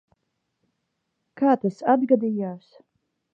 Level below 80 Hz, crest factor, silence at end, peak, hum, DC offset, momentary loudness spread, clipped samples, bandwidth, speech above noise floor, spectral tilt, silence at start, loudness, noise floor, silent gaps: -80 dBFS; 20 dB; 0.75 s; -6 dBFS; none; under 0.1%; 12 LU; under 0.1%; 7.4 kHz; 55 dB; -9 dB/octave; 1.35 s; -23 LUFS; -77 dBFS; none